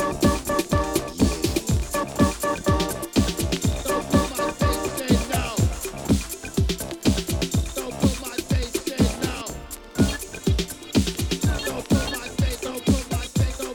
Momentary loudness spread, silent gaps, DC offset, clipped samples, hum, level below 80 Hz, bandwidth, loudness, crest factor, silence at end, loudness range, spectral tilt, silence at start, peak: 5 LU; none; under 0.1%; under 0.1%; none; -32 dBFS; 19 kHz; -24 LUFS; 18 dB; 0 s; 2 LU; -5 dB/octave; 0 s; -6 dBFS